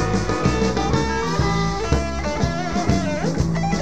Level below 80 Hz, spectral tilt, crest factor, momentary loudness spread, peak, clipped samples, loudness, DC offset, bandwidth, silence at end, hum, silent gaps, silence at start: -30 dBFS; -5.5 dB/octave; 18 dB; 3 LU; -4 dBFS; under 0.1%; -21 LUFS; 2%; 9.6 kHz; 0 s; none; none; 0 s